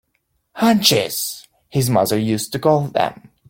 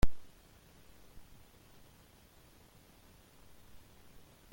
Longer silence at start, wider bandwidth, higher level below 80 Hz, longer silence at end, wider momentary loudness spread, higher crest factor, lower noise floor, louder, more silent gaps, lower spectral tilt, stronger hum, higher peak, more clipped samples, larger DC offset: first, 0.55 s vs 0.05 s; about the same, 17 kHz vs 17 kHz; second, -56 dBFS vs -46 dBFS; about the same, 0.35 s vs 0.45 s; first, 10 LU vs 1 LU; about the same, 18 dB vs 22 dB; first, -69 dBFS vs -61 dBFS; first, -18 LUFS vs -56 LUFS; neither; about the same, -4.5 dB/octave vs -5.5 dB/octave; neither; first, 0 dBFS vs -14 dBFS; neither; neither